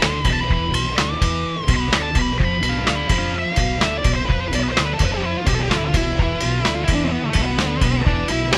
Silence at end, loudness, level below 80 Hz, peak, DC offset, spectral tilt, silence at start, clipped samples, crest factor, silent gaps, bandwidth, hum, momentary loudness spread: 0 s; -20 LUFS; -24 dBFS; -4 dBFS; under 0.1%; -5 dB/octave; 0 s; under 0.1%; 14 dB; none; 12.5 kHz; none; 2 LU